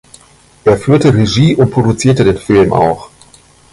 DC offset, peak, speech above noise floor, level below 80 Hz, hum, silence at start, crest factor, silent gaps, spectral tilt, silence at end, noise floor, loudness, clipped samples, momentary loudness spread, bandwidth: under 0.1%; 0 dBFS; 34 dB; -36 dBFS; 60 Hz at -35 dBFS; 0.65 s; 12 dB; none; -6.5 dB/octave; 0.65 s; -43 dBFS; -11 LUFS; under 0.1%; 5 LU; 11.5 kHz